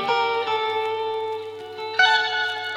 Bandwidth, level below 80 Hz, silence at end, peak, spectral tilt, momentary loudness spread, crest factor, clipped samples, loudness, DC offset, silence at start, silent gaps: 13 kHz; -74 dBFS; 0 s; -6 dBFS; -1.5 dB/octave; 14 LU; 18 dB; under 0.1%; -22 LUFS; under 0.1%; 0 s; none